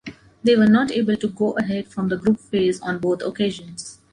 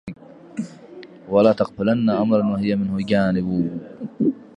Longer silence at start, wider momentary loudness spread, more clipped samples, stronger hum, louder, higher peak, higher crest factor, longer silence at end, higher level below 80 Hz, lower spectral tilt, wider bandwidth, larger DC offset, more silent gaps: about the same, 0.05 s vs 0.05 s; second, 11 LU vs 18 LU; neither; neither; about the same, -21 LUFS vs -20 LUFS; second, -6 dBFS vs -2 dBFS; about the same, 16 dB vs 18 dB; about the same, 0.2 s vs 0.15 s; about the same, -56 dBFS vs -52 dBFS; second, -6 dB/octave vs -8.5 dB/octave; first, 10.5 kHz vs 8.8 kHz; neither; neither